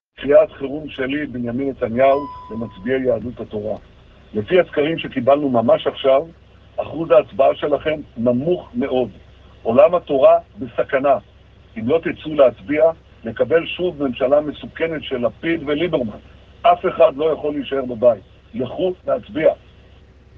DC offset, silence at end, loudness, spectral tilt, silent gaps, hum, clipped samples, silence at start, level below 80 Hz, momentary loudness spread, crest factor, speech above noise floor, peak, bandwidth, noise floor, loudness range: under 0.1%; 0.85 s; -19 LUFS; -8.5 dB/octave; none; none; under 0.1%; 0.2 s; -48 dBFS; 13 LU; 18 dB; 28 dB; 0 dBFS; 4.3 kHz; -46 dBFS; 3 LU